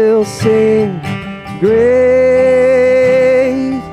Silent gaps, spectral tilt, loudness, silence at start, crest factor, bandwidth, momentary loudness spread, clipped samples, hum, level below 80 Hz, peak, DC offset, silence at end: none; -6.5 dB/octave; -11 LUFS; 0 s; 10 dB; 11.5 kHz; 10 LU; under 0.1%; none; -46 dBFS; 0 dBFS; under 0.1%; 0 s